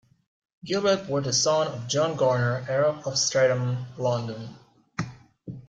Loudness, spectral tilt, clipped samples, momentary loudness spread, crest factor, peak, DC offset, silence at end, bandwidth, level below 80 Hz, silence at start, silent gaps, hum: -25 LUFS; -4 dB/octave; under 0.1%; 17 LU; 16 dB; -10 dBFS; under 0.1%; 0.05 s; 9.4 kHz; -64 dBFS; 0.65 s; none; none